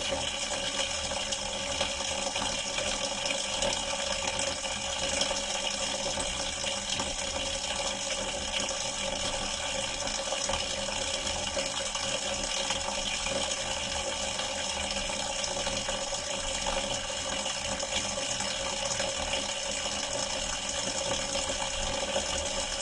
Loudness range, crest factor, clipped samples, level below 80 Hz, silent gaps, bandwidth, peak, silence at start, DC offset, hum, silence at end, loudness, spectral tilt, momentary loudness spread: 1 LU; 18 dB; under 0.1%; -48 dBFS; none; 11.5 kHz; -14 dBFS; 0 s; under 0.1%; none; 0 s; -30 LUFS; -1 dB/octave; 2 LU